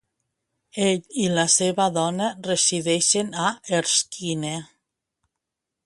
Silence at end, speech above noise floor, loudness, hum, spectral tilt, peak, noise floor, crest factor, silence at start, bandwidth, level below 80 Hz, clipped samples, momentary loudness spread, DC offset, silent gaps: 1.2 s; 61 dB; -22 LUFS; none; -3 dB/octave; -4 dBFS; -84 dBFS; 20 dB; 0.75 s; 11.5 kHz; -66 dBFS; under 0.1%; 9 LU; under 0.1%; none